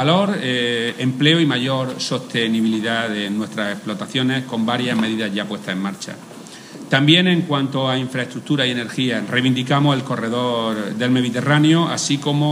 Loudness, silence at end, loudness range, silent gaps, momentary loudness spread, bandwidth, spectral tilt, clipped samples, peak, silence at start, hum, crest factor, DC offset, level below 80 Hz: -19 LUFS; 0 s; 4 LU; none; 10 LU; 15.5 kHz; -5 dB/octave; under 0.1%; 0 dBFS; 0 s; none; 18 dB; under 0.1%; -66 dBFS